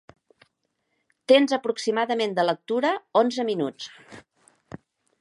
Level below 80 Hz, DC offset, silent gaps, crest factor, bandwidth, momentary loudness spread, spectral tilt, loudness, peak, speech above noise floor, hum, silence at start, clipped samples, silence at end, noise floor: -72 dBFS; under 0.1%; none; 22 dB; 11.5 kHz; 20 LU; -4.5 dB/octave; -23 LUFS; -4 dBFS; 52 dB; none; 1.3 s; under 0.1%; 1 s; -76 dBFS